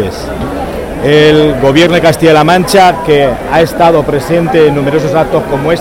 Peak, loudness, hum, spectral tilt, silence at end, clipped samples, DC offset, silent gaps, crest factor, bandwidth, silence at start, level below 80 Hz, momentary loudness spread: 0 dBFS; -8 LUFS; none; -5.5 dB/octave; 0 s; 0.9%; under 0.1%; none; 8 dB; 16.5 kHz; 0 s; -28 dBFS; 11 LU